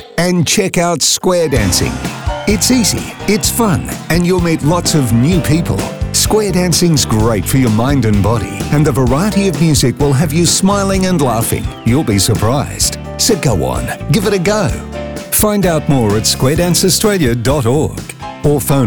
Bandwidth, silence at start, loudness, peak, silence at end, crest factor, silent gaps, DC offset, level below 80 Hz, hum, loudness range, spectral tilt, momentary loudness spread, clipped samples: over 20 kHz; 0 s; -12 LUFS; -2 dBFS; 0 s; 12 dB; none; 0.5%; -28 dBFS; none; 2 LU; -4.5 dB/octave; 7 LU; under 0.1%